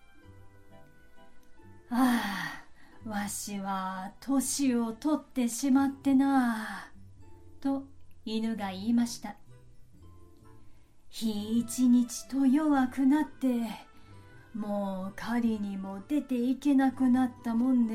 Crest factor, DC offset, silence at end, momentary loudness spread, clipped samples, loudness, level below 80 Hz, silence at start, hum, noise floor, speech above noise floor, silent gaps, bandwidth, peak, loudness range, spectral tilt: 16 dB; under 0.1%; 0 s; 13 LU; under 0.1%; -30 LUFS; -62 dBFS; 0.15 s; none; -52 dBFS; 24 dB; none; 16 kHz; -14 dBFS; 7 LU; -4.5 dB/octave